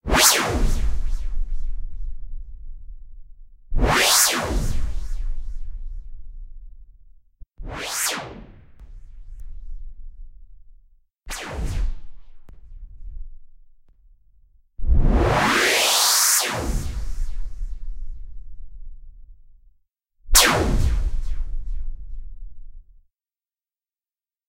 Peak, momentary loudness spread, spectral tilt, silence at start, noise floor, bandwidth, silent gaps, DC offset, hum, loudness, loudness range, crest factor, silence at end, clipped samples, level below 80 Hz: 0 dBFS; 27 LU; -2 dB/octave; 0.05 s; under -90 dBFS; 16 kHz; none; under 0.1%; none; -20 LUFS; 18 LU; 22 dB; 1.65 s; under 0.1%; -26 dBFS